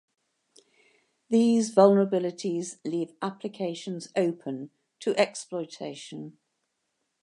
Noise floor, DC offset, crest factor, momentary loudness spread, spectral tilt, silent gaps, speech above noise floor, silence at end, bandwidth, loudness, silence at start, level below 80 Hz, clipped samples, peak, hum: -79 dBFS; under 0.1%; 24 dB; 19 LU; -5.5 dB/octave; none; 52 dB; 0.9 s; 11 kHz; -27 LUFS; 1.3 s; -82 dBFS; under 0.1%; -4 dBFS; none